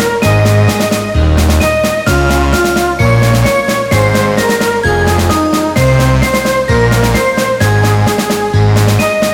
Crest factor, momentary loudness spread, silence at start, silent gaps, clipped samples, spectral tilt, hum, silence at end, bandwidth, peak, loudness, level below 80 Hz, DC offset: 10 dB; 3 LU; 0 s; none; under 0.1%; -5.5 dB/octave; none; 0 s; 17.5 kHz; 0 dBFS; -11 LUFS; -20 dBFS; under 0.1%